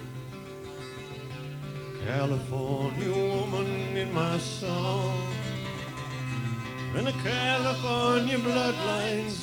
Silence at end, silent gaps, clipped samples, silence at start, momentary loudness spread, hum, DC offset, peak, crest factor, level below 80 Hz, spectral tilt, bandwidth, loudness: 0 s; none; under 0.1%; 0 s; 14 LU; none; under 0.1%; -12 dBFS; 18 dB; -56 dBFS; -5.5 dB/octave; 18.5 kHz; -29 LUFS